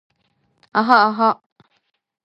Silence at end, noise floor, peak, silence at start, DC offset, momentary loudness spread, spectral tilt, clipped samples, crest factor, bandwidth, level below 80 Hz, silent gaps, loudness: 0.9 s; -66 dBFS; 0 dBFS; 0.75 s; under 0.1%; 10 LU; -6 dB/octave; under 0.1%; 20 dB; 8.2 kHz; -74 dBFS; none; -16 LUFS